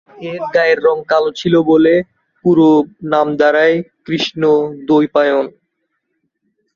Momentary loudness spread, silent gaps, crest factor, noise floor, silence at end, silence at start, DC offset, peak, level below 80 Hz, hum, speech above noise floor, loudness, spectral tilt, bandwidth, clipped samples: 9 LU; none; 12 dB; -70 dBFS; 1.25 s; 0.2 s; under 0.1%; -2 dBFS; -56 dBFS; none; 57 dB; -14 LUFS; -6.5 dB/octave; 7.2 kHz; under 0.1%